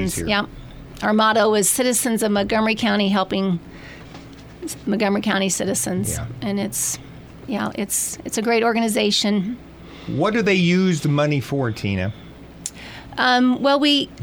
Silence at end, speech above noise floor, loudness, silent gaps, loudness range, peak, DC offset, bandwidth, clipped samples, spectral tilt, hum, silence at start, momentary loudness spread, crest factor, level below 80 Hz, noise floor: 0 s; 20 dB; -20 LUFS; none; 4 LU; -4 dBFS; under 0.1%; over 20 kHz; under 0.1%; -4 dB/octave; none; 0 s; 19 LU; 16 dB; -46 dBFS; -39 dBFS